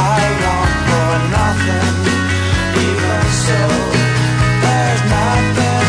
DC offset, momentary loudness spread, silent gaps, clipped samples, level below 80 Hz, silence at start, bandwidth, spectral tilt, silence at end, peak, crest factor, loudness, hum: under 0.1%; 2 LU; none; under 0.1%; -28 dBFS; 0 s; 11 kHz; -5 dB/octave; 0 s; -2 dBFS; 10 dB; -14 LUFS; none